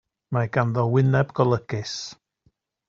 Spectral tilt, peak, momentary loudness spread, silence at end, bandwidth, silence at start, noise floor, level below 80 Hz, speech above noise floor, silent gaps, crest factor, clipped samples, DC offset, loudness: -6.5 dB/octave; -4 dBFS; 12 LU; 0.75 s; 7.4 kHz; 0.3 s; -67 dBFS; -58 dBFS; 45 dB; none; 20 dB; under 0.1%; under 0.1%; -23 LUFS